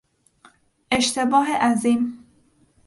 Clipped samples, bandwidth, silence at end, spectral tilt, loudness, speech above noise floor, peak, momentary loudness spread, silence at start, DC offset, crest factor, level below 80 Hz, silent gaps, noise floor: under 0.1%; 11.5 kHz; 0.7 s; -3 dB/octave; -20 LUFS; 39 dB; -6 dBFS; 6 LU; 0.9 s; under 0.1%; 18 dB; -58 dBFS; none; -59 dBFS